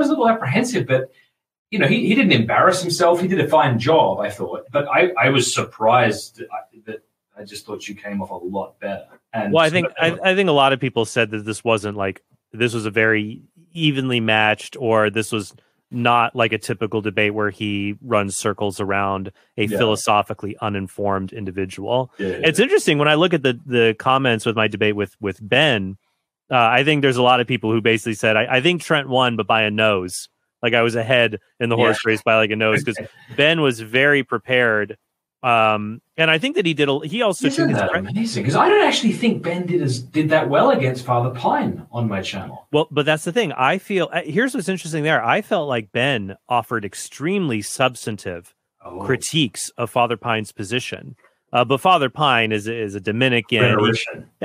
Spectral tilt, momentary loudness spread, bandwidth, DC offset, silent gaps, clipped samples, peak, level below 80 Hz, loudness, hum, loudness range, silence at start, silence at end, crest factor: -4.5 dB/octave; 13 LU; 16 kHz; under 0.1%; 1.59-1.66 s; under 0.1%; -2 dBFS; -64 dBFS; -19 LUFS; none; 5 LU; 0 s; 0 s; 18 dB